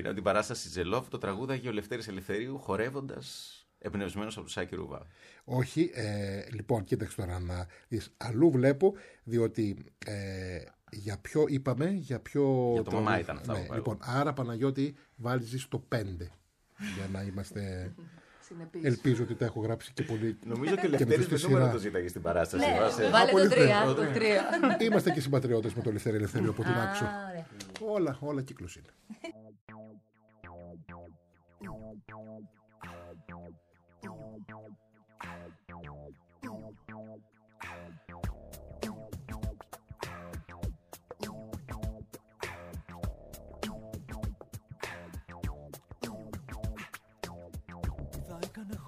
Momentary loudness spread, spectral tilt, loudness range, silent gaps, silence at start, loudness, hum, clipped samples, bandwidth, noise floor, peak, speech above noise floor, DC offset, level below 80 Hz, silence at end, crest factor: 22 LU; -6 dB/octave; 23 LU; 29.61-29.67 s; 0 s; -32 LUFS; none; under 0.1%; 15.5 kHz; -62 dBFS; -8 dBFS; 31 dB; under 0.1%; -52 dBFS; 0 s; 24 dB